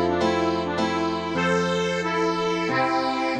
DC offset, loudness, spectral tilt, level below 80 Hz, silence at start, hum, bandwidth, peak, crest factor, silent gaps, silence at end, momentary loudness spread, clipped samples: under 0.1%; -23 LUFS; -5 dB/octave; -54 dBFS; 0 s; none; 10 kHz; -10 dBFS; 14 dB; none; 0 s; 2 LU; under 0.1%